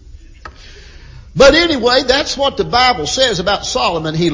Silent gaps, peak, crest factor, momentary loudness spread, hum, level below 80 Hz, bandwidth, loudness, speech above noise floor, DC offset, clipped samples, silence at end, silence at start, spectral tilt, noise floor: none; 0 dBFS; 14 dB; 8 LU; none; -34 dBFS; 7.6 kHz; -12 LUFS; 24 dB; under 0.1%; under 0.1%; 0 s; 0.1 s; -3.5 dB/octave; -36 dBFS